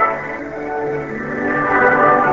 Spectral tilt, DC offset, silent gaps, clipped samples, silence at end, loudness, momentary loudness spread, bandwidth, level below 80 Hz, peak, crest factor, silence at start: -7.5 dB/octave; 0.3%; none; under 0.1%; 0 s; -17 LUFS; 13 LU; 7.6 kHz; -46 dBFS; -2 dBFS; 16 dB; 0 s